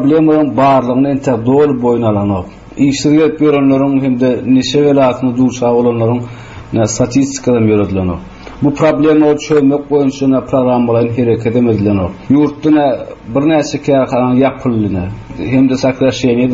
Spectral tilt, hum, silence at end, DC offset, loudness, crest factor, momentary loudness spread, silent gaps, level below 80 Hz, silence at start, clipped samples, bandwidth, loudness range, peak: -6.5 dB/octave; none; 0 s; under 0.1%; -12 LUFS; 12 dB; 7 LU; none; -40 dBFS; 0 s; under 0.1%; 8 kHz; 2 LU; 0 dBFS